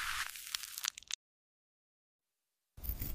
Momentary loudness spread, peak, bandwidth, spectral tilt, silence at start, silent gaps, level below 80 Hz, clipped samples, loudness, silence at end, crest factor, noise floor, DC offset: 6 LU; -14 dBFS; 16 kHz; -0.5 dB/octave; 0 s; 1.15-2.19 s; -54 dBFS; under 0.1%; -41 LUFS; 0 s; 32 dB; -89 dBFS; under 0.1%